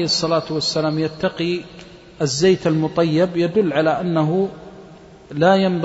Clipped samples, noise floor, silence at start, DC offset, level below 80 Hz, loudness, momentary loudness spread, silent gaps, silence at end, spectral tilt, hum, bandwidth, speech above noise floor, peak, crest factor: under 0.1%; -42 dBFS; 0 s; under 0.1%; -52 dBFS; -19 LUFS; 9 LU; none; 0 s; -5.5 dB/octave; none; 8 kHz; 24 dB; -2 dBFS; 16 dB